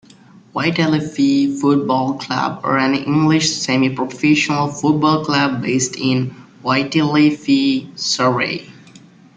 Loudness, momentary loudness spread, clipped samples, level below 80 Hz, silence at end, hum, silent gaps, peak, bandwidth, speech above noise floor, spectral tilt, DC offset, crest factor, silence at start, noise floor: -17 LUFS; 6 LU; under 0.1%; -56 dBFS; 0.65 s; none; none; -2 dBFS; 9.4 kHz; 29 dB; -4.5 dB/octave; under 0.1%; 16 dB; 0.55 s; -45 dBFS